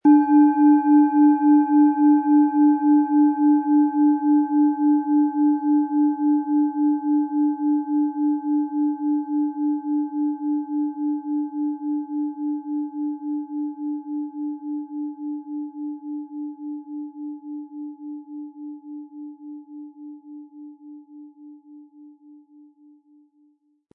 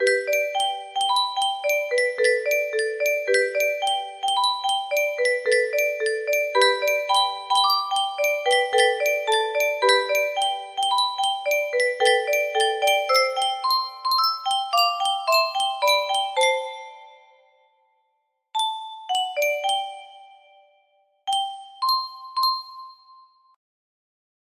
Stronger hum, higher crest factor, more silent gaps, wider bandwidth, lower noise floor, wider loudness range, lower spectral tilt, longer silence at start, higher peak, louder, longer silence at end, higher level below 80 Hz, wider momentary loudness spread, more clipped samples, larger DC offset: neither; about the same, 16 dB vs 18 dB; neither; second, 2.5 kHz vs 15.5 kHz; second, -62 dBFS vs -73 dBFS; first, 20 LU vs 7 LU; first, -11 dB/octave vs 1.5 dB/octave; about the same, 0.05 s vs 0 s; about the same, -6 dBFS vs -6 dBFS; about the same, -21 LUFS vs -22 LUFS; first, 1.85 s vs 1.6 s; second, -82 dBFS vs -76 dBFS; first, 20 LU vs 7 LU; neither; neither